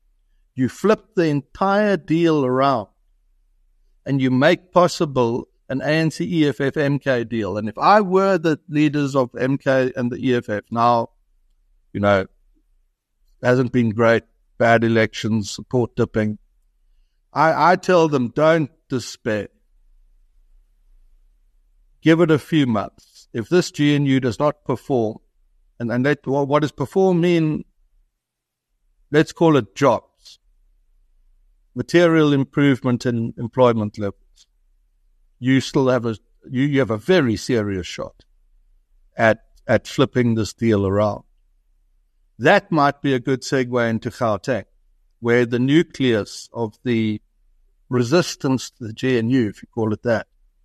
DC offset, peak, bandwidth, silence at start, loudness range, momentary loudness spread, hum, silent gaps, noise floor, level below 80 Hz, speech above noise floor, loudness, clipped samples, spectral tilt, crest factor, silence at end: under 0.1%; -2 dBFS; 13 kHz; 0.55 s; 3 LU; 11 LU; none; none; -81 dBFS; -54 dBFS; 63 dB; -19 LUFS; under 0.1%; -6.5 dB/octave; 18 dB; 0.4 s